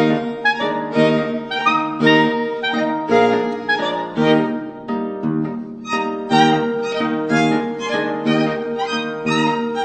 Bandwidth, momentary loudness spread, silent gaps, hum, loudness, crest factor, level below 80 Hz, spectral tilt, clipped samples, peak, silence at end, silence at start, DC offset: 9 kHz; 8 LU; none; none; -18 LUFS; 16 dB; -56 dBFS; -5.5 dB/octave; under 0.1%; -2 dBFS; 0 s; 0 s; under 0.1%